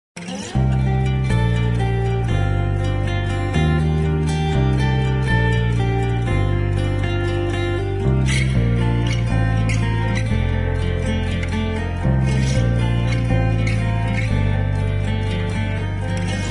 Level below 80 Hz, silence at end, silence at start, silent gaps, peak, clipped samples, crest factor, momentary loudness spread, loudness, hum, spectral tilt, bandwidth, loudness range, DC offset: -26 dBFS; 0 s; 0.15 s; none; -6 dBFS; under 0.1%; 12 dB; 4 LU; -20 LUFS; none; -7 dB/octave; 11 kHz; 1 LU; under 0.1%